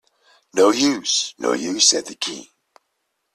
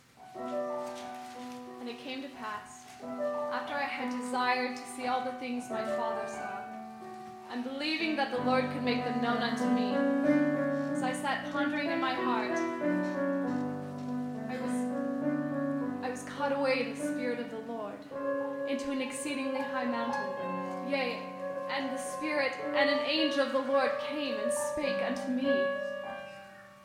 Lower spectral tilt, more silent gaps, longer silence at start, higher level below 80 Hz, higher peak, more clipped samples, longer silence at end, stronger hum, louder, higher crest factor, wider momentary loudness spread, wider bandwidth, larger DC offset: second, -1 dB/octave vs -4.5 dB/octave; neither; first, 0.55 s vs 0.15 s; first, -66 dBFS vs -74 dBFS; first, -2 dBFS vs -14 dBFS; neither; first, 0.9 s vs 0 s; neither; first, -18 LUFS vs -32 LUFS; about the same, 20 dB vs 18 dB; about the same, 12 LU vs 12 LU; second, 14 kHz vs 16 kHz; neither